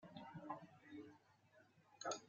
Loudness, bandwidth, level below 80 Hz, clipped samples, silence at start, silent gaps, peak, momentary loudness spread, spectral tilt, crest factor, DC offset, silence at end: -55 LUFS; 7.6 kHz; under -90 dBFS; under 0.1%; 0 s; none; -30 dBFS; 9 LU; -3.5 dB/octave; 26 dB; under 0.1%; 0 s